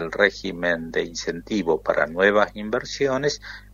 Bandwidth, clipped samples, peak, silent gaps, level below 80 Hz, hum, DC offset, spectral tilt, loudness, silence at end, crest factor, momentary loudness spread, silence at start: 7.6 kHz; under 0.1%; -2 dBFS; none; -48 dBFS; none; under 0.1%; -4 dB/octave; -23 LUFS; 0 s; 22 dB; 9 LU; 0 s